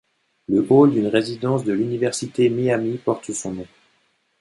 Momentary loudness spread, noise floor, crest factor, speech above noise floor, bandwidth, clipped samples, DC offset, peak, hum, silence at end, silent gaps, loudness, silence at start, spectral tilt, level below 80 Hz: 13 LU; -65 dBFS; 18 dB; 46 dB; 11.5 kHz; under 0.1%; under 0.1%; -2 dBFS; none; 0.75 s; none; -20 LUFS; 0.5 s; -6 dB/octave; -60 dBFS